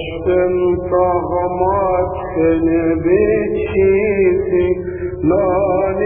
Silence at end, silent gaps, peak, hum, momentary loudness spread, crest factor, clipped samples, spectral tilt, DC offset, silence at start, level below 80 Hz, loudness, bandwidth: 0 s; none; -2 dBFS; none; 5 LU; 14 dB; under 0.1%; -12 dB/octave; under 0.1%; 0 s; -34 dBFS; -16 LUFS; 3.6 kHz